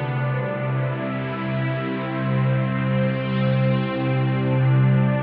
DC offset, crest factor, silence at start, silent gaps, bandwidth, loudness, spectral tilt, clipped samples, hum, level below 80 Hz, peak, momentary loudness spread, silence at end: under 0.1%; 12 dB; 0 s; none; 4.5 kHz; -22 LUFS; -7 dB/octave; under 0.1%; none; -54 dBFS; -10 dBFS; 7 LU; 0 s